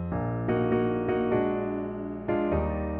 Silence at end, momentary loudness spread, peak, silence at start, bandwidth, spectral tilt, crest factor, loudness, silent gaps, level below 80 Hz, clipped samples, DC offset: 0 s; 6 LU; -14 dBFS; 0 s; 4 kHz; -8 dB/octave; 14 dB; -28 LUFS; none; -42 dBFS; under 0.1%; under 0.1%